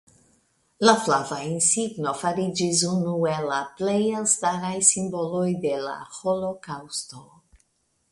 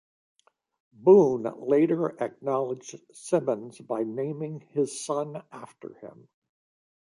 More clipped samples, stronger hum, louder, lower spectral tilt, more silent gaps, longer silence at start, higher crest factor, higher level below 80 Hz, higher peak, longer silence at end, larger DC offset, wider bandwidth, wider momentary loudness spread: neither; neither; first, -23 LUFS vs -26 LUFS; second, -3.5 dB/octave vs -6.5 dB/octave; neither; second, 0.8 s vs 1 s; about the same, 24 dB vs 20 dB; first, -64 dBFS vs -76 dBFS; first, -2 dBFS vs -8 dBFS; about the same, 0.9 s vs 0.9 s; neither; about the same, 11.5 kHz vs 11.5 kHz; second, 12 LU vs 25 LU